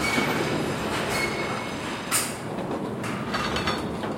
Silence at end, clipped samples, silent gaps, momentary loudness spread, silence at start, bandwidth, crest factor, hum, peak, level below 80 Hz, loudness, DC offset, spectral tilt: 0 s; under 0.1%; none; 6 LU; 0 s; 16.5 kHz; 18 dB; none; -10 dBFS; -50 dBFS; -27 LUFS; under 0.1%; -3.5 dB/octave